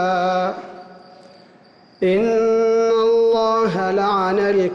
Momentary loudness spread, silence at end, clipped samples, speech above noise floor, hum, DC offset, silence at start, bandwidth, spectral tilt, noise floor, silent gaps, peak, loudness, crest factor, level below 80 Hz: 7 LU; 0 s; under 0.1%; 32 dB; none; under 0.1%; 0 s; 7.2 kHz; -6 dB/octave; -49 dBFS; none; -10 dBFS; -18 LUFS; 8 dB; -58 dBFS